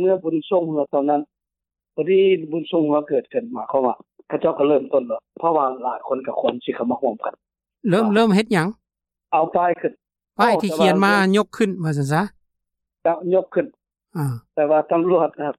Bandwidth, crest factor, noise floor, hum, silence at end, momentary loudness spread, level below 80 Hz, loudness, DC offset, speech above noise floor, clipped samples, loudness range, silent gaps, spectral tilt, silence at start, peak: 14.5 kHz; 16 dB; -86 dBFS; none; 0.05 s; 11 LU; -64 dBFS; -20 LUFS; under 0.1%; 67 dB; under 0.1%; 3 LU; none; -6.5 dB/octave; 0 s; -4 dBFS